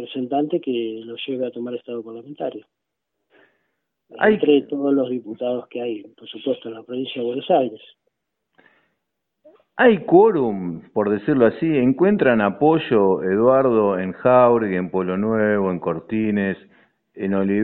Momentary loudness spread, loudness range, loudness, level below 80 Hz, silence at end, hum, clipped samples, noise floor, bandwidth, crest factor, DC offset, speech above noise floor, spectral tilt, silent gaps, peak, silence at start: 14 LU; 10 LU; -20 LUFS; -60 dBFS; 0 s; none; under 0.1%; -78 dBFS; 4.2 kHz; 20 dB; under 0.1%; 59 dB; -11 dB/octave; none; 0 dBFS; 0 s